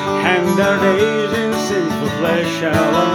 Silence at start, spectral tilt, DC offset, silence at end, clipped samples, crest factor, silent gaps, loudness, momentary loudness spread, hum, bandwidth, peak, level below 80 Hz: 0 s; -5 dB/octave; under 0.1%; 0 s; under 0.1%; 16 dB; none; -16 LUFS; 4 LU; none; over 20 kHz; 0 dBFS; -50 dBFS